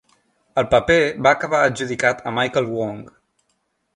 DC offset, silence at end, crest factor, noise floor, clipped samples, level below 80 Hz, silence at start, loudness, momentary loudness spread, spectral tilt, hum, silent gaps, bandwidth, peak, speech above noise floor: under 0.1%; 0.85 s; 18 dB; -70 dBFS; under 0.1%; -48 dBFS; 0.55 s; -19 LUFS; 10 LU; -4.5 dB/octave; none; none; 11 kHz; -2 dBFS; 51 dB